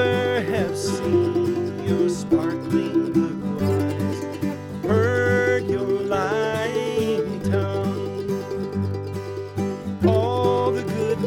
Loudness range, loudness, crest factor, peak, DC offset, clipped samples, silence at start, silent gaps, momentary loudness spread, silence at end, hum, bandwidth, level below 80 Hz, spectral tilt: 3 LU; -23 LUFS; 16 dB; -6 dBFS; under 0.1%; under 0.1%; 0 s; none; 8 LU; 0 s; none; 17 kHz; -54 dBFS; -6.5 dB/octave